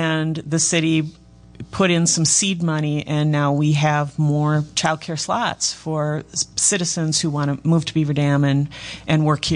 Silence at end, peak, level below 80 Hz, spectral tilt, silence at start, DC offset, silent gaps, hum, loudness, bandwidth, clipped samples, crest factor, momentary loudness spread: 0 s; -6 dBFS; -50 dBFS; -4 dB/octave; 0 s; under 0.1%; none; none; -19 LUFS; 10.5 kHz; under 0.1%; 14 dB; 7 LU